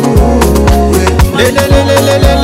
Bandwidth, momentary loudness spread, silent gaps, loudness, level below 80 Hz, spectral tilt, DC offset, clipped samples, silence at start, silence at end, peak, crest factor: 16.5 kHz; 2 LU; none; -8 LUFS; -12 dBFS; -5.5 dB/octave; under 0.1%; 1%; 0 s; 0 s; 0 dBFS; 6 dB